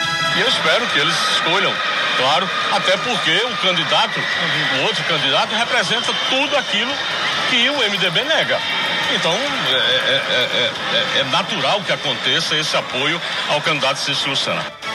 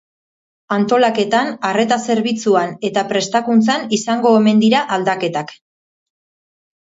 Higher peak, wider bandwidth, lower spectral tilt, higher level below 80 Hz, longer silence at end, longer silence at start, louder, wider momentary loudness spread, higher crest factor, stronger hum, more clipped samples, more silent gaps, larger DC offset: about the same, -2 dBFS vs 0 dBFS; first, 15 kHz vs 8 kHz; second, -2.5 dB/octave vs -4.5 dB/octave; about the same, -60 dBFS vs -64 dBFS; second, 0 s vs 1.3 s; second, 0 s vs 0.7 s; about the same, -16 LUFS vs -16 LUFS; second, 3 LU vs 8 LU; about the same, 16 dB vs 16 dB; neither; neither; neither; neither